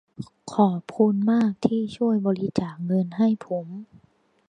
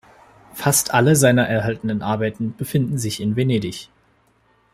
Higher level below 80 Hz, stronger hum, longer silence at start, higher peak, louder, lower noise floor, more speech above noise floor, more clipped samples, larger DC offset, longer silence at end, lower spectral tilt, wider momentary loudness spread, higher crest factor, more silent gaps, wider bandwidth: second, -64 dBFS vs -52 dBFS; neither; second, 0.2 s vs 0.55 s; about the same, -4 dBFS vs -2 dBFS; second, -24 LUFS vs -19 LUFS; about the same, -62 dBFS vs -60 dBFS; about the same, 39 dB vs 41 dB; neither; neither; second, 0.65 s vs 0.9 s; first, -8.5 dB/octave vs -5 dB/octave; about the same, 12 LU vs 11 LU; about the same, 20 dB vs 18 dB; neither; second, 9.4 kHz vs 16 kHz